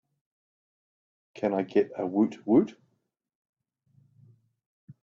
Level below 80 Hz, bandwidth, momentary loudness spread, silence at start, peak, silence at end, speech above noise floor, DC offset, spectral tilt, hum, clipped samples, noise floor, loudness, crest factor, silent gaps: -74 dBFS; 7.2 kHz; 7 LU; 1.35 s; -10 dBFS; 2.35 s; 51 dB; under 0.1%; -8.5 dB/octave; none; under 0.1%; -77 dBFS; -27 LUFS; 20 dB; none